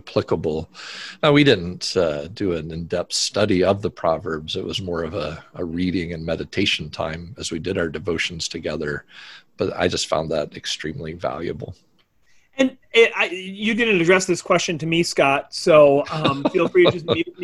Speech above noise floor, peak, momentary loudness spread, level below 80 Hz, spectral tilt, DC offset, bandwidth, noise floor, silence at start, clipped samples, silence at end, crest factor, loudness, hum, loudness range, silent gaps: 37 dB; -2 dBFS; 13 LU; -46 dBFS; -4.5 dB/octave; under 0.1%; 12.5 kHz; -58 dBFS; 0.05 s; under 0.1%; 0 s; 20 dB; -21 LUFS; none; 8 LU; none